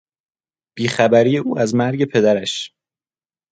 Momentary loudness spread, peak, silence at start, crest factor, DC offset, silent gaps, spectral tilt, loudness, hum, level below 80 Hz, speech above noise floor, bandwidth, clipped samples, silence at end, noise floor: 11 LU; 0 dBFS; 0.75 s; 18 dB; under 0.1%; none; -5.5 dB/octave; -17 LUFS; none; -62 dBFS; over 74 dB; 9.4 kHz; under 0.1%; 0.85 s; under -90 dBFS